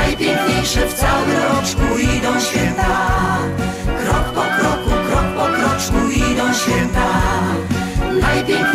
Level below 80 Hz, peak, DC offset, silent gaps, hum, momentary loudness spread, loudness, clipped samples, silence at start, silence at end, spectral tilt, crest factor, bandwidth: -24 dBFS; -2 dBFS; under 0.1%; none; none; 3 LU; -17 LUFS; under 0.1%; 0 s; 0 s; -4.5 dB/octave; 14 dB; 16 kHz